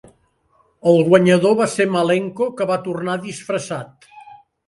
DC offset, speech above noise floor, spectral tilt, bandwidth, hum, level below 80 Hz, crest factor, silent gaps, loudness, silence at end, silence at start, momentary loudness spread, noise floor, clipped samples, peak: under 0.1%; 43 dB; -6 dB/octave; 11.5 kHz; none; -62 dBFS; 18 dB; none; -18 LUFS; 0.35 s; 0.85 s; 13 LU; -60 dBFS; under 0.1%; 0 dBFS